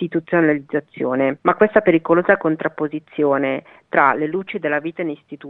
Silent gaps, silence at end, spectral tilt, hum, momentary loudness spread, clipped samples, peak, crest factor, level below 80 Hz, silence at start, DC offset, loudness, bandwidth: none; 0 s; -9.5 dB/octave; none; 11 LU; under 0.1%; 0 dBFS; 18 dB; -60 dBFS; 0 s; under 0.1%; -19 LUFS; 4.1 kHz